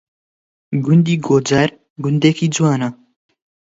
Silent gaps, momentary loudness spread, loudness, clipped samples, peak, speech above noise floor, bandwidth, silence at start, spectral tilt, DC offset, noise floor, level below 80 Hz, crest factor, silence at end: 1.90-1.96 s; 9 LU; -16 LUFS; under 0.1%; 0 dBFS; over 75 dB; 8 kHz; 0.7 s; -6 dB/octave; under 0.1%; under -90 dBFS; -56 dBFS; 16 dB; 0.85 s